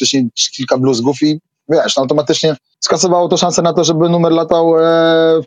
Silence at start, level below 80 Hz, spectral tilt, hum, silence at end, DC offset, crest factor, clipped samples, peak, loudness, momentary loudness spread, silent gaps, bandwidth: 0 s; -56 dBFS; -4.5 dB/octave; none; 0 s; under 0.1%; 12 dB; under 0.1%; 0 dBFS; -12 LUFS; 6 LU; none; 9.6 kHz